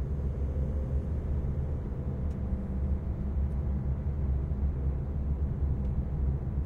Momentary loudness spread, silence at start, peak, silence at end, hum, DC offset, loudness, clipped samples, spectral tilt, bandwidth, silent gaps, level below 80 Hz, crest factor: 2 LU; 0 s; -18 dBFS; 0 s; none; under 0.1%; -33 LUFS; under 0.1%; -11 dB/octave; 2.6 kHz; none; -32 dBFS; 12 dB